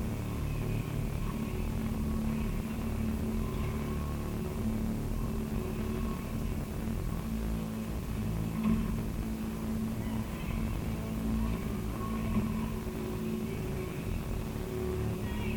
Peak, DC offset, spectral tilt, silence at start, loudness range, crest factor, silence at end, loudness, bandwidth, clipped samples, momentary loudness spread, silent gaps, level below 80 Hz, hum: -18 dBFS; under 0.1%; -7 dB/octave; 0 s; 1 LU; 16 dB; 0 s; -35 LUFS; over 20 kHz; under 0.1%; 4 LU; none; -40 dBFS; none